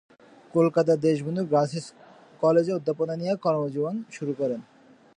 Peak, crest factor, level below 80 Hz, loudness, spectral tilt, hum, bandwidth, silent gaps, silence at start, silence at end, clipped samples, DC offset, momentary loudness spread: -10 dBFS; 16 dB; -72 dBFS; -25 LUFS; -7.5 dB/octave; none; 10 kHz; none; 0.55 s; 0.55 s; under 0.1%; under 0.1%; 10 LU